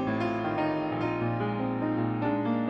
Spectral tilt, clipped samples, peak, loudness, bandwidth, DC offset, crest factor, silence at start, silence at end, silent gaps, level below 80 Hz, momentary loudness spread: -9 dB/octave; under 0.1%; -16 dBFS; -29 LUFS; 6.2 kHz; under 0.1%; 12 dB; 0 s; 0 s; none; -58 dBFS; 1 LU